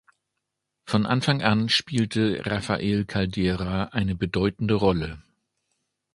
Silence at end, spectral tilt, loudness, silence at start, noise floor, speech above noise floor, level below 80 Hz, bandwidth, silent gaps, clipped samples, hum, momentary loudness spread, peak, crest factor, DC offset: 0.95 s; -6 dB/octave; -24 LUFS; 0.85 s; -81 dBFS; 58 dB; -44 dBFS; 11.5 kHz; none; under 0.1%; none; 5 LU; -4 dBFS; 22 dB; under 0.1%